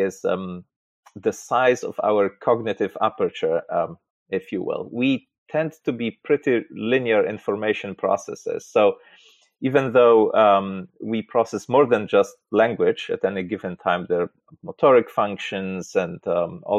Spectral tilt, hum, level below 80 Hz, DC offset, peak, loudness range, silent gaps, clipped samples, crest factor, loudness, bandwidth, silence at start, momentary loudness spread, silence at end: -6 dB/octave; none; -68 dBFS; under 0.1%; -6 dBFS; 6 LU; 0.76-1.03 s, 4.10-4.26 s, 5.38-5.46 s; under 0.1%; 16 dB; -22 LUFS; 9.4 kHz; 0 s; 12 LU; 0 s